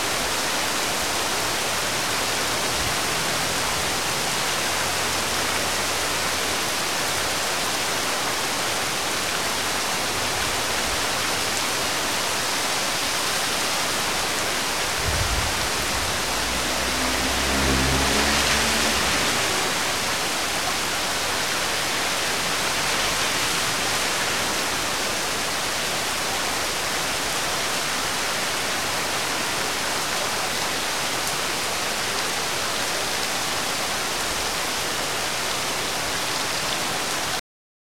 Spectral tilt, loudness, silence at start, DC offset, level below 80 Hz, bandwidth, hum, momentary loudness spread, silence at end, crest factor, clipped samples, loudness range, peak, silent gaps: -1.5 dB/octave; -22 LUFS; 0 s; 1%; -42 dBFS; 16.5 kHz; none; 3 LU; 0.45 s; 20 dB; under 0.1%; 3 LU; -4 dBFS; none